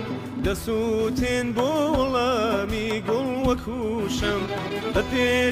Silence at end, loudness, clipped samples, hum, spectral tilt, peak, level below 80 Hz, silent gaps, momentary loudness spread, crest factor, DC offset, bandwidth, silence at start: 0 s; -24 LUFS; under 0.1%; none; -5 dB/octave; -10 dBFS; -40 dBFS; none; 5 LU; 14 dB; under 0.1%; 16 kHz; 0 s